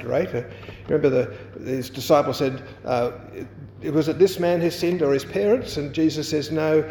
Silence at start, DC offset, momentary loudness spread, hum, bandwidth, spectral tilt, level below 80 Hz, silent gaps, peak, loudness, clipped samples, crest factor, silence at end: 0 s; under 0.1%; 15 LU; none; 19 kHz; -6 dB/octave; -52 dBFS; none; -4 dBFS; -23 LUFS; under 0.1%; 18 dB; 0 s